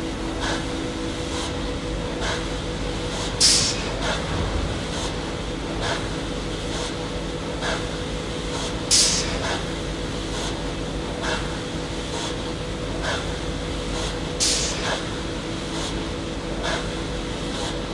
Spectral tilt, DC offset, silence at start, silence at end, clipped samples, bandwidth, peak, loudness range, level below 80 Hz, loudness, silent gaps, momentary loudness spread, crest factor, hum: -3 dB/octave; under 0.1%; 0 s; 0 s; under 0.1%; 11.5 kHz; -4 dBFS; 5 LU; -34 dBFS; -25 LUFS; none; 10 LU; 22 dB; none